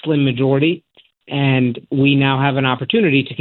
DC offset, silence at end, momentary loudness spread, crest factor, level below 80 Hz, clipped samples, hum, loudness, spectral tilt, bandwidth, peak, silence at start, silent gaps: under 0.1%; 0 s; 5 LU; 16 dB; -58 dBFS; under 0.1%; none; -16 LUFS; -11 dB/octave; 4.2 kHz; -2 dBFS; 0.05 s; none